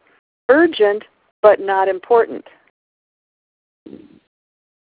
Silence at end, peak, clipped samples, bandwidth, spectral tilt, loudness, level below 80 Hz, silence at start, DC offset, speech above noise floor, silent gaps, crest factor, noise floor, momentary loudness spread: 2.5 s; 0 dBFS; under 0.1%; 4 kHz; -8 dB/octave; -15 LUFS; -64 dBFS; 0.5 s; under 0.1%; over 76 dB; 1.31-1.43 s; 18 dB; under -90 dBFS; 13 LU